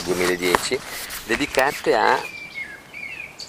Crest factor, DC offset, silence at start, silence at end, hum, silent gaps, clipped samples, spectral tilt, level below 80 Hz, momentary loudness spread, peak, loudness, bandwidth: 22 dB; under 0.1%; 0 s; 0 s; none; none; under 0.1%; -3 dB/octave; -50 dBFS; 14 LU; 0 dBFS; -22 LUFS; 16 kHz